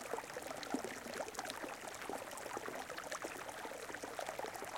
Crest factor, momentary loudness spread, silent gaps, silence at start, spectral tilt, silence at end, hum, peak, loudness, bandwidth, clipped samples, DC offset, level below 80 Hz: 24 dB; 3 LU; none; 0 s; -2.5 dB/octave; 0 s; none; -22 dBFS; -45 LUFS; 17 kHz; under 0.1%; under 0.1%; -74 dBFS